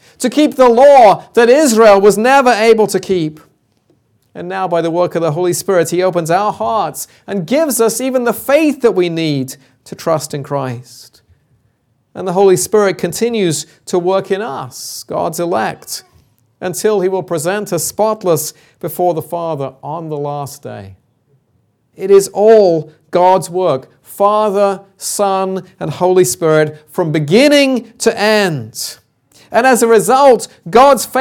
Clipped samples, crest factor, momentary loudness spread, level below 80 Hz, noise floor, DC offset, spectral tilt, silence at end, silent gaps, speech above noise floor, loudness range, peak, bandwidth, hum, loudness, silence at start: under 0.1%; 14 dB; 15 LU; -54 dBFS; -59 dBFS; under 0.1%; -4.5 dB/octave; 0 s; none; 47 dB; 7 LU; 0 dBFS; 18.5 kHz; none; -12 LUFS; 0.2 s